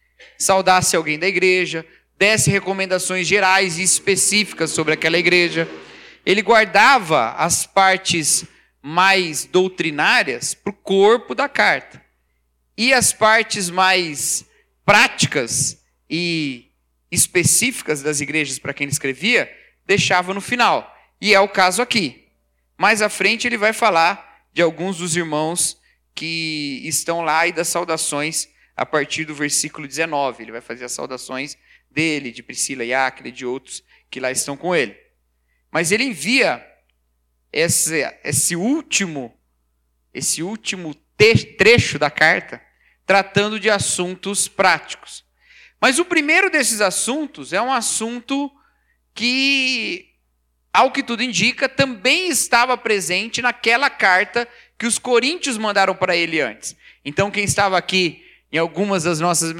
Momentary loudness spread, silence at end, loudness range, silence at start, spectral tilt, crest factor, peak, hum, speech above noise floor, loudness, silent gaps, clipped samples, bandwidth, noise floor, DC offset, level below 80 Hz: 13 LU; 0 s; 6 LU; 0.2 s; -2.5 dB/octave; 18 dB; 0 dBFS; none; 48 dB; -17 LUFS; none; under 0.1%; 18 kHz; -66 dBFS; under 0.1%; -54 dBFS